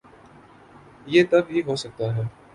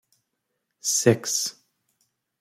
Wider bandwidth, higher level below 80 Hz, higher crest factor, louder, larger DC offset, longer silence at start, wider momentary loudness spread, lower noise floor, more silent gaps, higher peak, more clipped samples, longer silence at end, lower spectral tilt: second, 11.5 kHz vs 16.5 kHz; first, -58 dBFS vs -66 dBFS; about the same, 20 dB vs 24 dB; about the same, -22 LUFS vs -23 LUFS; neither; first, 1.05 s vs 0.85 s; about the same, 11 LU vs 10 LU; second, -49 dBFS vs -79 dBFS; neither; about the same, -4 dBFS vs -4 dBFS; neither; second, 0.25 s vs 0.9 s; first, -6.5 dB/octave vs -3.5 dB/octave